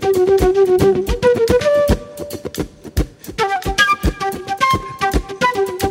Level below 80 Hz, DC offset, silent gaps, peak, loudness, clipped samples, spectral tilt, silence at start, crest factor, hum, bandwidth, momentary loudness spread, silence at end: -28 dBFS; under 0.1%; none; -2 dBFS; -16 LUFS; under 0.1%; -5 dB/octave; 0 s; 14 dB; none; 16.5 kHz; 12 LU; 0 s